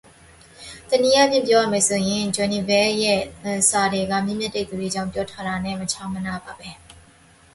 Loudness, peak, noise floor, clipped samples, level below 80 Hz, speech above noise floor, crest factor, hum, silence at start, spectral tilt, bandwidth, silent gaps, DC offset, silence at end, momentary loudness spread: -21 LUFS; -4 dBFS; -52 dBFS; under 0.1%; -52 dBFS; 31 dB; 18 dB; none; 0.6 s; -3 dB/octave; 12 kHz; none; under 0.1%; 0.65 s; 15 LU